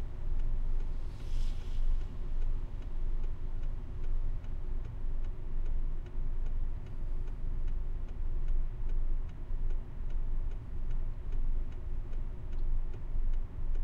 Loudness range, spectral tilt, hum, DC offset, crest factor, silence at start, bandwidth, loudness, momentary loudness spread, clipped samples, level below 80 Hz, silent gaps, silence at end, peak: 1 LU; -8 dB/octave; none; under 0.1%; 10 dB; 0 s; 3 kHz; -42 LUFS; 4 LU; under 0.1%; -32 dBFS; none; 0 s; -20 dBFS